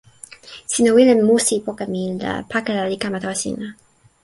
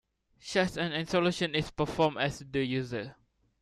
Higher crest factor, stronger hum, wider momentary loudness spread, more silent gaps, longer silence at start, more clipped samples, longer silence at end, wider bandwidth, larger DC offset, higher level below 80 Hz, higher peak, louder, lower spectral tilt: about the same, 18 dB vs 20 dB; neither; first, 19 LU vs 10 LU; neither; about the same, 0.45 s vs 0.45 s; neither; about the same, 0.5 s vs 0.5 s; second, 12 kHz vs 13.5 kHz; neither; about the same, -56 dBFS vs -56 dBFS; first, -2 dBFS vs -12 dBFS; first, -18 LUFS vs -31 LUFS; about the same, -4 dB/octave vs -5 dB/octave